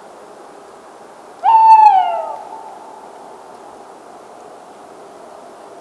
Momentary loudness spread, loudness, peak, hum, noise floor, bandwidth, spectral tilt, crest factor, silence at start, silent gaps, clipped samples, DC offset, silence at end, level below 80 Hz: 30 LU; -10 LUFS; 0 dBFS; none; -39 dBFS; 11.5 kHz; -2.5 dB/octave; 16 dB; 1.45 s; none; under 0.1%; under 0.1%; 3.1 s; -74 dBFS